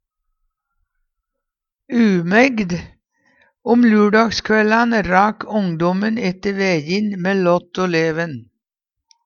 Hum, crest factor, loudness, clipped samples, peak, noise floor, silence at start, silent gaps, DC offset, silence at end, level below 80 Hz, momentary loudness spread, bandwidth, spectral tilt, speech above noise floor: none; 18 dB; -17 LUFS; under 0.1%; 0 dBFS; -83 dBFS; 1.9 s; none; under 0.1%; 0.85 s; -50 dBFS; 9 LU; 7 kHz; -6 dB/octave; 67 dB